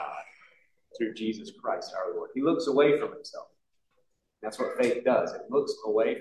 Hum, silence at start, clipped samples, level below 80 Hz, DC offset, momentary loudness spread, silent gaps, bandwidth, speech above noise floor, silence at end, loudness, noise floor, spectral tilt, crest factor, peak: none; 0 s; under 0.1%; -78 dBFS; under 0.1%; 16 LU; none; 12 kHz; 47 dB; 0 s; -29 LUFS; -75 dBFS; -5 dB/octave; 20 dB; -10 dBFS